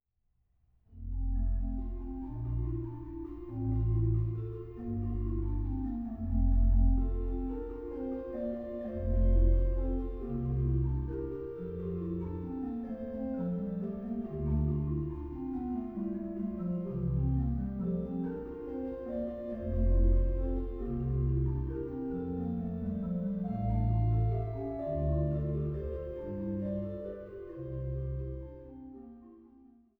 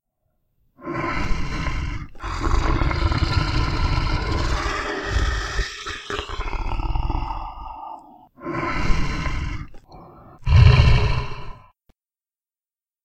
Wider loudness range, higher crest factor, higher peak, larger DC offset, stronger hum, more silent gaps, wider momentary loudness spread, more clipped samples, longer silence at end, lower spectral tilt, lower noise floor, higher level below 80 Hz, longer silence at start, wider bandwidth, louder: second, 4 LU vs 8 LU; about the same, 16 dB vs 20 dB; second, -16 dBFS vs -2 dBFS; neither; neither; neither; second, 11 LU vs 17 LU; neither; second, 0.5 s vs 1.45 s; first, -12.5 dB/octave vs -6 dB/octave; second, -76 dBFS vs under -90 dBFS; second, -36 dBFS vs -26 dBFS; about the same, 0.9 s vs 0.8 s; second, 2.2 kHz vs 9.2 kHz; second, -35 LUFS vs -23 LUFS